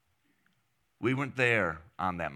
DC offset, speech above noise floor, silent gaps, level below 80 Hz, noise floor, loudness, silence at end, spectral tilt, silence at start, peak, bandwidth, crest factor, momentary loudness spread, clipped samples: under 0.1%; 45 dB; none; -62 dBFS; -76 dBFS; -30 LUFS; 0 s; -6 dB/octave; 1 s; -12 dBFS; 12.5 kHz; 22 dB; 8 LU; under 0.1%